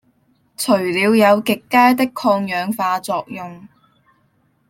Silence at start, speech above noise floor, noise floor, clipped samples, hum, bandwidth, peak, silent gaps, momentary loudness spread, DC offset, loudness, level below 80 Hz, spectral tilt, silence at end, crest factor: 0.6 s; 45 dB; -61 dBFS; under 0.1%; none; 16.5 kHz; -2 dBFS; none; 12 LU; under 0.1%; -16 LUFS; -64 dBFS; -4.5 dB/octave; 1.05 s; 16 dB